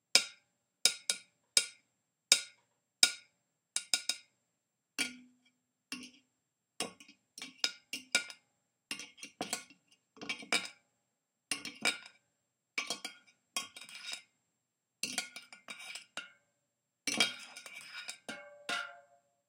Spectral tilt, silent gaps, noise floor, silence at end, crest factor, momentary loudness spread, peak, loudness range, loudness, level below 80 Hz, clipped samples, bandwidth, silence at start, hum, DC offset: 1 dB/octave; none; -85 dBFS; 0.5 s; 34 dB; 19 LU; -6 dBFS; 11 LU; -35 LUFS; under -90 dBFS; under 0.1%; 16.5 kHz; 0.15 s; none; under 0.1%